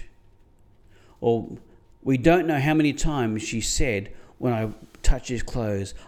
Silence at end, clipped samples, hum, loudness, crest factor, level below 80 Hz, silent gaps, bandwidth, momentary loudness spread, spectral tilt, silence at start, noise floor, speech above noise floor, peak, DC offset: 0.05 s; under 0.1%; none; -25 LUFS; 20 dB; -32 dBFS; none; 14.5 kHz; 12 LU; -5.5 dB/octave; 0 s; -54 dBFS; 32 dB; -4 dBFS; under 0.1%